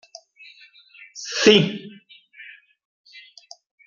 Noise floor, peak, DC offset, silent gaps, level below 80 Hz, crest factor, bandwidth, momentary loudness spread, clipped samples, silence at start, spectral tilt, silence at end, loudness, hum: -50 dBFS; -2 dBFS; under 0.1%; none; -66 dBFS; 24 dB; 7.4 kHz; 28 LU; under 0.1%; 1.15 s; -4 dB/octave; 1.45 s; -17 LUFS; none